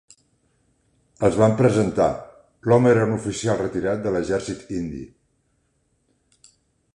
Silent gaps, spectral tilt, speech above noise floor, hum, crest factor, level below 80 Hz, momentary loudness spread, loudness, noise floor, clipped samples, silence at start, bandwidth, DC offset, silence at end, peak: none; -7 dB/octave; 48 dB; none; 20 dB; -50 dBFS; 14 LU; -21 LUFS; -68 dBFS; under 0.1%; 1.2 s; 11 kHz; under 0.1%; 1.85 s; -2 dBFS